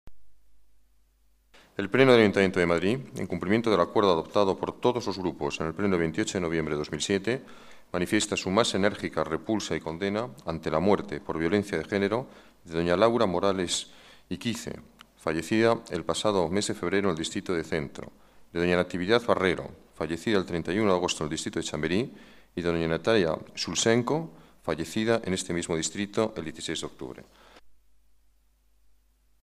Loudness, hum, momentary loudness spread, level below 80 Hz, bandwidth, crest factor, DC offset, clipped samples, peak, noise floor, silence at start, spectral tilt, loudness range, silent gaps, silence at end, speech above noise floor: -27 LUFS; none; 11 LU; -56 dBFS; 14 kHz; 22 dB; under 0.1%; under 0.1%; -6 dBFS; -64 dBFS; 0.05 s; -4.5 dB/octave; 4 LU; none; 1.75 s; 37 dB